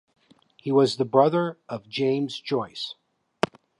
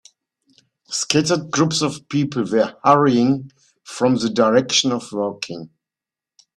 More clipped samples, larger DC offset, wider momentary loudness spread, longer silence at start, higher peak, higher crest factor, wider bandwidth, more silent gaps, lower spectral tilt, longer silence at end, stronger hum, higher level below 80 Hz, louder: neither; neither; first, 14 LU vs 11 LU; second, 0.65 s vs 0.9 s; about the same, -2 dBFS vs 0 dBFS; about the same, 22 dB vs 20 dB; second, 11 kHz vs 12.5 kHz; neither; first, -6 dB/octave vs -4.5 dB/octave; about the same, 0.9 s vs 0.9 s; neither; second, -68 dBFS vs -60 dBFS; second, -25 LUFS vs -18 LUFS